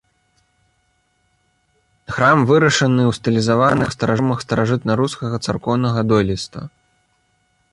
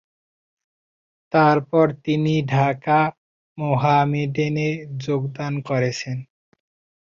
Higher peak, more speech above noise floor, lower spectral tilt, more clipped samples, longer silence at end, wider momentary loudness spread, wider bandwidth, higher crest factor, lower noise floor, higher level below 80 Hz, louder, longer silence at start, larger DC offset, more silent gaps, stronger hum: about the same, -2 dBFS vs -4 dBFS; second, 48 dB vs over 70 dB; about the same, -6 dB/octave vs -7 dB/octave; neither; first, 1.05 s vs 0.8 s; about the same, 10 LU vs 11 LU; first, 11.5 kHz vs 7.4 kHz; about the same, 16 dB vs 18 dB; second, -64 dBFS vs under -90 dBFS; first, -46 dBFS vs -60 dBFS; first, -17 LUFS vs -21 LUFS; first, 2.1 s vs 1.3 s; neither; second, none vs 3.18-3.56 s; neither